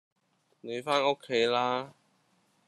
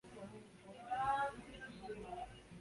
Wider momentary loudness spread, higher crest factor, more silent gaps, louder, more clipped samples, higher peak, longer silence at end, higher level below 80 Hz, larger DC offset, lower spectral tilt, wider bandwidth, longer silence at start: about the same, 16 LU vs 17 LU; about the same, 20 dB vs 18 dB; neither; first, -29 LUFS vs -44 LUFS; neither; first, -12 dBFS vs -28 dBFS; first, 0.8 s vs 0 s; second, -78 dBFS vs -66 dBFS; neither; about the same, -4 dB/octave vs -5 dB/octave; about the same, 12 kHz vs 11.5 kHz; first, 0.65 s vs 0.05 s